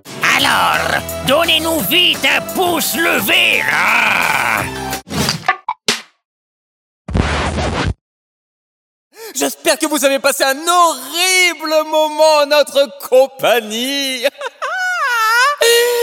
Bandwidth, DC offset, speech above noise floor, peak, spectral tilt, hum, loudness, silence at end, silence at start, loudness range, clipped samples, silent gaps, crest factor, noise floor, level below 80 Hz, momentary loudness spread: 18.5 kHz; under 0.1%; over 76 dB; 0 dBFS; -2.5 dB/octave; none; -13 LUFS; 0 s; 0.05 s; 8 LU; under 0.1%; 6.25-7.05 s, 8.01-9.11 s; 16 dB; under -90 dBFS; -36 dBFS; 9 LU